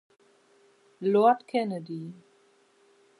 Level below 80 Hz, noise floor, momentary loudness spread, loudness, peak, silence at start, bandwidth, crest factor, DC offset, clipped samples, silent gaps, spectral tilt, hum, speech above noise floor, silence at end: -86 dBFS; -63 dBFS; 17 LU; -27 LUFS; -10 dBFS; 1 s; 11.5 kHz; 20 dB; under 0.1%; under 0.1%; none; -7.5 dB/octave; none; 38 dB; 1.05 s